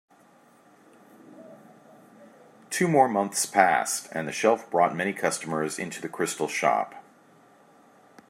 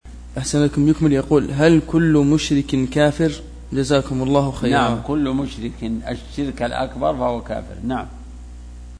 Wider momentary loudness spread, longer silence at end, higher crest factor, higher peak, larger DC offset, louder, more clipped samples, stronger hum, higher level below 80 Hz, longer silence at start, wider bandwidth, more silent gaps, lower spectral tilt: second, 10 LU vs 14 LU; first, 1.3 s vs 0 s; first, 26 dB vs 18 dB; about the same, -2 dBFS vs 0 dBFS; neither; second, -25 LUFS vs -19 LUFS; neither; second, none vs 60 Hz at -35 dBFS; second, -78 dBFS vs -36 dBFS; first, 1.3 s vs 0.05 s; first, 16 kHz vs 10.5 kHz; neither; second, -3.5 dB/octave vs -6.5 dB/octave